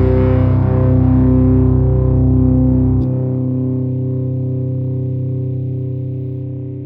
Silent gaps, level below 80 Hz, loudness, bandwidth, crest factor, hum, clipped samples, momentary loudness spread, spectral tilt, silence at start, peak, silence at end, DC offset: none; -24 dBFS; -15 LUFS; 3 kHz; 12 dB; none; under 0.1%; 10 LU; -13.5 dB/octave; 0 s; -2 dBFS; 0 s; under 0.1%